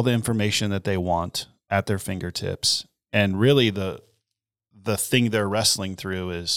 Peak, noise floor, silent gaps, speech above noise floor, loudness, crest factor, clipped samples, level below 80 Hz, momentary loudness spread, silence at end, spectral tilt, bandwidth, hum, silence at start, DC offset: -4 dBFS; -85 dBFS; none; 61 dB; -23 LUFS; 20 dB; under 0.1%; -52 dBFS; 10 LU; 0 s; -4 dB/octave; 19 kHz; none; 0 s; under 0.1%